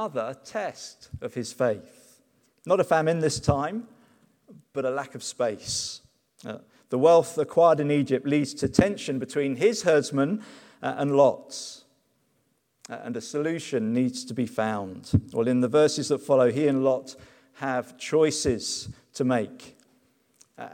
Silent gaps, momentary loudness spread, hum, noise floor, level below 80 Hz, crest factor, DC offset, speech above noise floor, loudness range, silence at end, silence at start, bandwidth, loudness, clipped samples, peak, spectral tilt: none; 16 LU; none; -71 dBFS; -54 dBFS; 24 dB; under 0.1%; 46 dB; 6 LU; 0 s; 0 s; 16.5 kHz; -25 LUFS; under 0.1%; -2 dBFS; -5 dB/octave